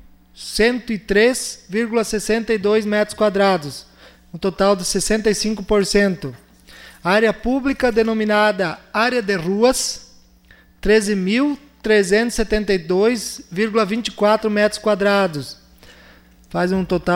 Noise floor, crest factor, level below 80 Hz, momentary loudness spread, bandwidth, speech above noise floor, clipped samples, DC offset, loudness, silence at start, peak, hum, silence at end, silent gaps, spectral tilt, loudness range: -50 dBFS; 16 dB; -40 dBFS; 9 LU; 16.5 kHz; 32 dB; under 0.1%; under 0.1%; -18 LUFS; 0.35 s; -4 dBFS; none; 0 s; none; -4 dB/octave; 2 LU